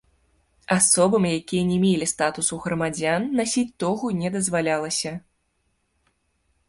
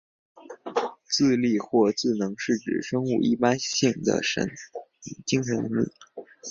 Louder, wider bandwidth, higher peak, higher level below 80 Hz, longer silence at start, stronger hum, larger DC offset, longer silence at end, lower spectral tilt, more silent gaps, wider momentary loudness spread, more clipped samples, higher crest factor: first, -22 LUFS vs -25 LUFS; first, 11.5 kHz vs 7.4 kHz; about the same, -6 dBFS vs -6 dBFS; first, -56 dBFS vs -62 dBFS; first, 0.7 s vs 0.35 s; neither; neither; first, 1.5 s vs 0 s; about the same, -4 dB/octave vs -4.5 dB/octave; neither; second, 8 LU vs 18 LU; neither; about the same, 18 dB vs 20 dB